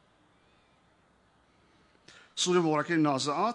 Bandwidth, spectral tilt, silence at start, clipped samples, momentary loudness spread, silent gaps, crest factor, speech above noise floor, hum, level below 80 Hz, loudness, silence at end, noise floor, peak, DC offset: 10.5 kHz; -4 dB/octave; 2.35 s; under 0.1%; 5 LU; none; 18 dB; 39 dB; none; -78 dBFS; -27 LUFS; 0 s; -66 dBFS; -12 dBFS; under 0.1%